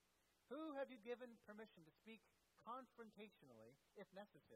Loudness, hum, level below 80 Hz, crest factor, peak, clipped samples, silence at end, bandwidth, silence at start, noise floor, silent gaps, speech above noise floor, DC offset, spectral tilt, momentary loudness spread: -58 LUFS; none; under -90 dBFS; 20 dB; -40 dBFS; under 0.1%; 0 s; 14 kHz; 0.5 s; -83 dBFS; none; 22 dB; under 0.1%; -5.5 dB/octave; 14 LU